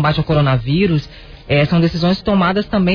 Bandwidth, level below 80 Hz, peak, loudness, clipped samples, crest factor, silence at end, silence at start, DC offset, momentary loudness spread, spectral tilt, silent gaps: 5.4 kHz; -34 dBFS; -4 dBFS; -15 LUFS; under 0.1%; 12 dB; 0 s; 0 s; under 0.1%; 3 LU; -8.5 dB/octave; none